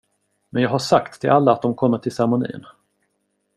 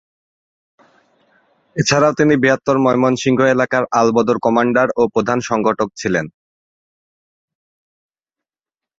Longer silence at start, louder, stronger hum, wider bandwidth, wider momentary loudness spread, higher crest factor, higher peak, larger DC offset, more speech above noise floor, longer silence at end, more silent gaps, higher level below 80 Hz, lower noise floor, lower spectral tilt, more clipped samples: second, 0.55 s vs 1.75 s; second, -19 LUFS vs -15 LUFS; neither; first, 13.5 kHz vs 7.8 kHz; first, 11 LU vs 6 LU; about the same, 18 dB vs 18 dB; about the same, -2 dBFS vs 0 dBFS; neither; second, 52 dB vs 74 dB; second, 1 s vs 2.7 s; neither; second, -60 dBFS vs -54 dBFS; second, -71 dBFS vs -89 dBFS; about the same, -6.5 dB/octave vs -5.5 dB/octave; neither